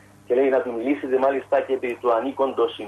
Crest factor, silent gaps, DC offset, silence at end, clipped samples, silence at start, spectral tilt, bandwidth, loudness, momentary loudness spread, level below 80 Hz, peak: 14 dB; none; under 0.1%; 0 s; under 0.1%; 0.3 s; -6 dB/octave; 12 kHz; -22 LUFS; 5 LU; -66 dBFS; -8 dBFS